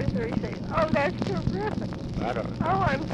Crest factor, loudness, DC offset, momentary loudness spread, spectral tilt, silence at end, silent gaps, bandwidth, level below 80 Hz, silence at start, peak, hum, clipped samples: 16 dB; -28 LUFS; under 0.1%; 6 LU; -7.5 dB/octave; 0 s; none; 10 kHz; -40 dBFS; 0 s; -10 dBFS; none; under 0.1%